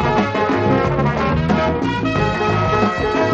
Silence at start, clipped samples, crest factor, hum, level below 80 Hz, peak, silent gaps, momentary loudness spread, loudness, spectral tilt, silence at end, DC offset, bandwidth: 0 s; under 0.1%; 14 dB; none; -32 dBFS; -4 dBFS; none; 2 LU; -17 LUFS; -7 dB/octave; 0 s; under 0.1%; 8 kHz